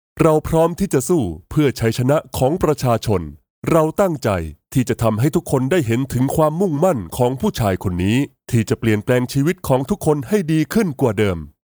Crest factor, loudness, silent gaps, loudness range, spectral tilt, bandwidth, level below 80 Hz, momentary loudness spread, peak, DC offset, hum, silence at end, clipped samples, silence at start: 18 dB; -18 LUFS; 3.50-3.62 s; 1 LU; -6.5 dB/octave; over 20 kHz; -40 dBFS; 4 LU; 0 dBFS; under 0.1%; none; 0.2 s; under 0.1%; 0.15 s